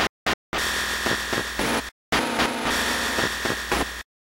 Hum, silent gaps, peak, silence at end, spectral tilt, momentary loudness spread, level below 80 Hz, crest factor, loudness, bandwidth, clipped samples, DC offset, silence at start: none; 0.09-0.26 s, 0.34-0.52 s, 1.92-2.12 s; -6 dBFS; 0.25 s; -2.5 dB/octave; 3 LU; -42 dBFS; 18 dB; -24 LUFS; 16.5 kHz; under 0.1%; under 0.1%; 0 s